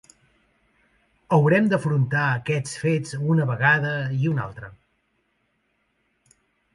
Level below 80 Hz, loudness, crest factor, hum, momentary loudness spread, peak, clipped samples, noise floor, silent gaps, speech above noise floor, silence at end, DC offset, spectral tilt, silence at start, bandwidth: -60 dBFS; -22 LUFS; 18 dB; none; 9 LU; -6 dBFS; under 0.1%; -70 dBFS; none; 49 dB; 2.05 s; under 0.1%; -7 dB/octave; 1.3 s; 11.5 kHz